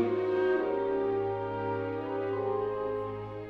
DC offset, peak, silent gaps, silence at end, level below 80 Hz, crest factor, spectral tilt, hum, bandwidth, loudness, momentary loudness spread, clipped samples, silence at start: under 0.1%; -18 dBFS; none; 0 s; -62 dBFS; 14 dB; -9 dB/octave; none; 5.2 kHz; -31 LUFS; 6 LU; under 0.1%; 0 s